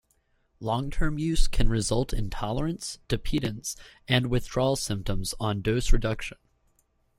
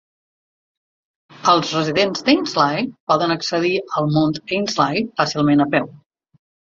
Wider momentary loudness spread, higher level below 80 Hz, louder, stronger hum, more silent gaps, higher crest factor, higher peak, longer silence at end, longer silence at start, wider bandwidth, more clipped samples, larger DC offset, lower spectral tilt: first, 9 LU vs 5 LU; first, -30 dBFS vs -60 dBFS; second, -29 LUFS vs -18 LUFS; neither; second, none vs 3.00-3.07 s; about the same, 20 dB vs 18 dB; second, -6 dBFS vs -2 dBFS; about the same, 0.9 s vs 0.8 s; second, 0.6 s vs 1.4 s; first, 13 kHz vs 7.6 kHz; neither; neither; about the same, -5 dB/octave vs -5 dB/octave